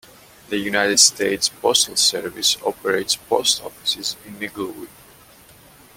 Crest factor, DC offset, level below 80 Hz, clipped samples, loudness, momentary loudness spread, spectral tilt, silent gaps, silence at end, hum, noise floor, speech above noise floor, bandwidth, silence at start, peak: 22 dB; under 0.1%; -58 dBFS; under 0.1%; -18 LUFS; 16 LU; -0.5 dB/octave; none; 1.1 s; none; -48 dBFS; 27 dB; 17 kHz; 0.5 s; 0 dBFS